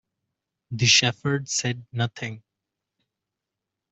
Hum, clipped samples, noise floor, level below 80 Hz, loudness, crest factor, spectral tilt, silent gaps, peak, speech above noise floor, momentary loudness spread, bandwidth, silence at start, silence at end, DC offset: none; under 0.1%; -85 dBFS; -62 dBFS; -22 LUFS; 24 dB; -2.5 dB/octave; none; -4 dBFS; 61 dB; 18 LU; 8.2 kHz; 0.7 s; 1.55 s; under 0.1%